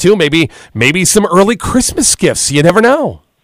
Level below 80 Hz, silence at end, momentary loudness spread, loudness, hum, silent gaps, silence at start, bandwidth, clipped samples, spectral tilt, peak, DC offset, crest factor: -34 dBFS; 0.25 s; 5 LU; -10 LUFS; none; none; 0 s; 16.5 kHz; 0.5%; -3.5 dB/octave; 0 dBFS; under 0.1%; 10 dB